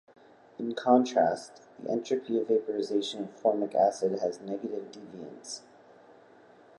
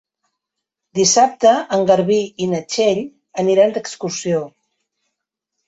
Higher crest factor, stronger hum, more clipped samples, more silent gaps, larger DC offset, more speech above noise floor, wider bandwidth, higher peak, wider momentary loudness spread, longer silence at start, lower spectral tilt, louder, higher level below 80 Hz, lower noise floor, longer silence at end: first, 22 dB vs 16 dB; neither; neither; neither; neither; second, 27 dB vs 64 dB; first, 11.5 kHz vs 8.2 kHz; second, -10 dBFS vs -2 dBFS; first, 19 LU vs 12 LU; second, 0.6 s vs 0.95 s; first, -5 dB/octave vs -3.5 dB/octave; second, -29 LUFS vs -17 LUFS; second, -80 dBFS vs -62 dBFS; second, -56 dBFS vs -80 dBFS; about the same, 1.2 s vs 1.2 s